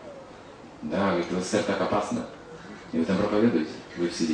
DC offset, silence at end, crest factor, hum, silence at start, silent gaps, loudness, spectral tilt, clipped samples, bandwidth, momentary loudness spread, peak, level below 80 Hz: under 0.1%; 0 s; 18 dB; none; 0 s; none; -27 LUFS; -5.5 dB/octave; under 0.1%; 10 kHz; 20 LU; -10 dBFS; -58 dBFS